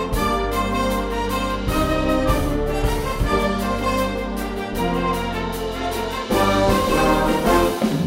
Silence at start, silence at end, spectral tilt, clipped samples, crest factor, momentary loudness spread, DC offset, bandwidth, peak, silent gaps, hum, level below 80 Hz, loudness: 0 s; 0 s; -5.5 dB/octave; under 0.1%; 16 dB; 8 LU; under 0.1%; 16.5 kHz; -4 dBFS; none; none; -28 dBFS; -21 LUFS